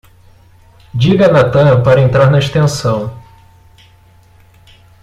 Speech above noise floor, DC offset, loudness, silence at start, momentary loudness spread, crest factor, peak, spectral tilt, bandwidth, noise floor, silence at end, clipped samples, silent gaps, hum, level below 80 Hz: 35 dB; under 0.1%; -10 LUFS; 0.95 s; 10 LU; 12 dB; 0 dBFS; -7 dB/octave; 12 kHz; -45 dBFS; 1.85 s; under 0.1%; none; none; -40 dBFS